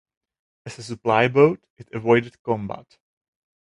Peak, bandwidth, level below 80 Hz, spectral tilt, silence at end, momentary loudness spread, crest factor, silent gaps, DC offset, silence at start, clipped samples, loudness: -2 dBFS; 11 kHz; -60 dBFS; -6.5 dB/octave; 0.85 s; 20 LU; 20 dB; 1.70-1.76 s, 2.39-2.45 s; under 0.1%; 0.65 s; under 0.1%; -21 LUFS